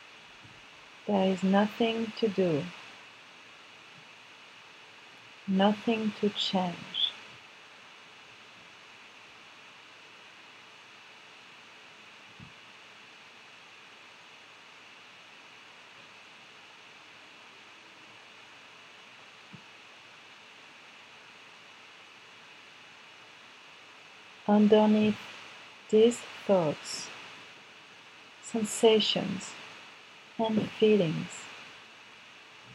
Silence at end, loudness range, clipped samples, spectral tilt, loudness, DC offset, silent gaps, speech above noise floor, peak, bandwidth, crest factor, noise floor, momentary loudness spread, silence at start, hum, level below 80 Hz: 0.95 s; 22 LU; under 0.1%; -5 dB/octave; -28 LUFS; under 0.1%; none; 26 dB; -10 dBFS; 12 kHz; 24 dB; -53 dBFS; 24 LU; 1.05 s; none; -78 dBFS